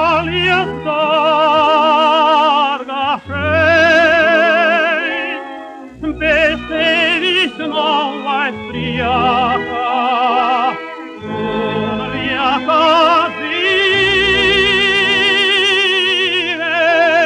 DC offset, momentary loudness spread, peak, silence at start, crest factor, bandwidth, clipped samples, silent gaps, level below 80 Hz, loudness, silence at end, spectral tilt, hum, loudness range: under 0.1%; 9 LU; -2 dBFS; 0 s; 12 dB; 10.5 kHz; under 0.1%; none; -42 dBFS; -13 LUFS; 0 s; -4 dB/octave; none; 5 LU